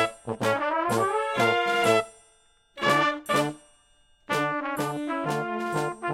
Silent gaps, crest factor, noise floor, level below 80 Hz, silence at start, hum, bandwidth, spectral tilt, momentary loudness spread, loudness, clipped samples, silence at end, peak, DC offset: none; 20 dB; -62 dBFS; -64 dBFS; 0 s; none; 17 kHz; -4.5 dB/octave; 7 LU; -26 LUFS; under 0.1%; 0 s; -8 dBFS; under 0.1%